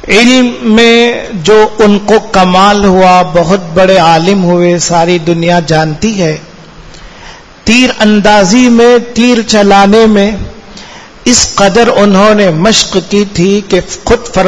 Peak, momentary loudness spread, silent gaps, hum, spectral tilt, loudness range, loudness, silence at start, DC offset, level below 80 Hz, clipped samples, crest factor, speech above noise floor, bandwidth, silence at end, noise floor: 0 dBFS; 7 LU; none; none; -4.5 dB/octave; 4 LU; -6 LUFS; 0 s; under 0.1%; -30 dBFS; 4%; 6 dB; 25 dB; 11 kHz; 0 s; -30 dBFS